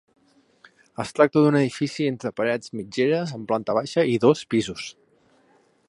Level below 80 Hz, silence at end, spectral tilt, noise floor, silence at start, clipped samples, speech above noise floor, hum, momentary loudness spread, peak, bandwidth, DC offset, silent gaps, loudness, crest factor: -64 dBFS; 1 s; -6 dB/octave; -61 dBFS; 1 s; under 0.1%; 39 dB; none; 13 LU; -2 dBFS; 11.5 kHz; under 0.1%; none; -23 LUFS; 22 dB